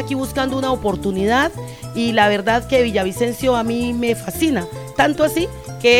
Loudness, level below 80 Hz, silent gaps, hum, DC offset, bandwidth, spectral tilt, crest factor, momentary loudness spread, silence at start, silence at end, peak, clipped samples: -18 LUFS; -40 dBFS; none; none; 0.2%; 17 kHz; -4.5 dB/octave; 16 dB; 7 LU; 0 s; 0 s; -2 dBFS; under 0.1%